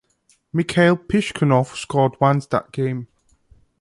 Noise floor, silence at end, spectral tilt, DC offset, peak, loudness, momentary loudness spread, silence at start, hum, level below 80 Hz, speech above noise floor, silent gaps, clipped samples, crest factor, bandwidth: -62 dBFS; 0.75 s; -6.5 dB/octave; under 0.1%; -2 dBFS; -20 LUFS; 8 LU; 0.55 s; none; -52 dBFS; 43 dB; none; under 0.1%; 18 dB; 11.5 kHz